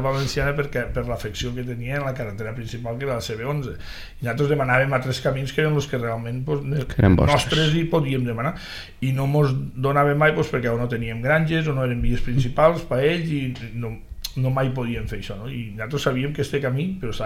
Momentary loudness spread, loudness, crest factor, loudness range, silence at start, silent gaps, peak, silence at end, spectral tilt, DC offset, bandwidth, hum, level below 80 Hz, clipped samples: 13 LU; -23 LUFS; 20 dB; 6 LU; 0 s; none; -2 dBFS; 0 s; -6.5 dB/octave; under 0.1%; 16 kHz; none; -36 dBFS; under 0.1%